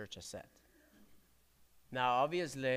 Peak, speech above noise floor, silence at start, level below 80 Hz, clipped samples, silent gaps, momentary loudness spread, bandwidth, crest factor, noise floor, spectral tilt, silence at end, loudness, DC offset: -20 dBFS; 33 dB; 0 s; -74 dBFS; under 0.1%; none; 16 LU; 15.5 kHz; 20 dB; -70 dBFS; -4.5 dB/octave; 0 s; -36 LUFS; under 0.1%